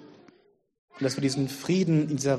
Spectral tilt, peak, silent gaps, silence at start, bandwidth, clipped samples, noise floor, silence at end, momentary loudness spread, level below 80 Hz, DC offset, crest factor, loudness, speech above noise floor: -6 dB/octave; -12 dBFS; 0.79-0.88 s; 0 s; 13 kHz; under 0.1%; -63 dBFS; 0 s; 6 LU; -66 dBFS; under 0.1%; 16 dB; -27 LUFS; 37 dB